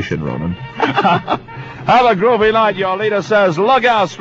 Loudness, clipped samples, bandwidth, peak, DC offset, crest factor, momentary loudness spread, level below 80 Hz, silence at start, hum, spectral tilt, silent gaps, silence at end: -14 LUFS; under 0.1%; 7.8 kHz; 0 dBFS; under 0.1%; 14 dB; 10 LU; -44 dBFS; 0 s; none; -6 dB/octave; none; 0 s